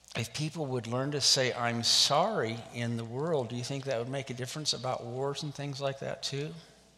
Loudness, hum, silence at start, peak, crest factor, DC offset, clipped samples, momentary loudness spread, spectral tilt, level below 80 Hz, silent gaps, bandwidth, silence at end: -31 LUFS; none; 0.1 s; -12 dBFS; 20 dB; under 0.1%; under 0.1%; 12 LU; -3.5 dB/octave; -68 dBFS; none; 15.5 kHz; 0.25 s